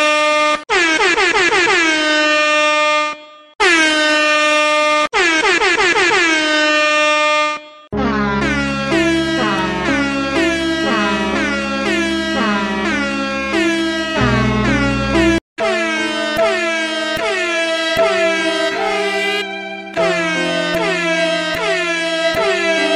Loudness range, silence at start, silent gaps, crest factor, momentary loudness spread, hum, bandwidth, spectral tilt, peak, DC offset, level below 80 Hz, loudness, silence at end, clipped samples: 5 LU; 0 s; 15.41-15.56 s; 14 dB; 6 LU; none; 15 kHz; -3.5 dB/octave; -2 dBFS; under 0.1%; -38 dBFS; -14 LUFS; 0 s; under 0.1%